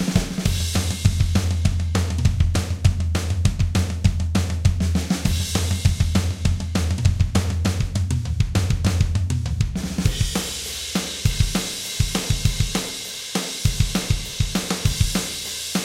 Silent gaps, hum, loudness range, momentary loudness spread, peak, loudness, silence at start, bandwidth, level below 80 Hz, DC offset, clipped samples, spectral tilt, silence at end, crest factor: none; none; 2 LU; 4 LU; -2 dBFS; -22 LUFS; 0 s; 16.5 kHz; -28 dBFS; under 0.1%; under 0.1%; -4.5 dB/octave; 0 s; 18 dB